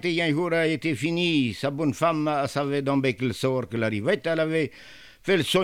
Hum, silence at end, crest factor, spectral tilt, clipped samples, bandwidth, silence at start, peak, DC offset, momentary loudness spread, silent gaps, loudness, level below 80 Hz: none; 0 s; 16 dB; -5.5 dB/octave; under 0.1%; 16.5 kHz; 0 s; -8 dBFS; 0.1%; 4 LU; none; -25 LUFS; -60 dBFS